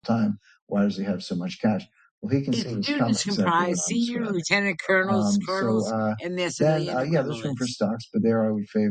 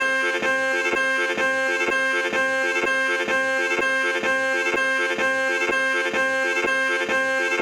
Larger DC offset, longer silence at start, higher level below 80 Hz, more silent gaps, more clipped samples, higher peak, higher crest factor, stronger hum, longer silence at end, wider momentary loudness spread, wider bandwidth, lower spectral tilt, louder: neither; about the same, 0.05 s vs 0 s; about the same, -62 dBFS vs -62 dBFS; first, 0.62-0.67 s, 2.11-2.22 s vs none; neither; first, -6 dBFS vs -10 dBFS; first, 18 dB vs 12 dB; neither; about the same, 0 s vs 0 s; first, 6 LU vs 1 LU; second, 9.4 kHz vs 15 kHz; first, -5 dB/octave vs -2 dB/octave; second, -25 LUFS vs -21 LUFS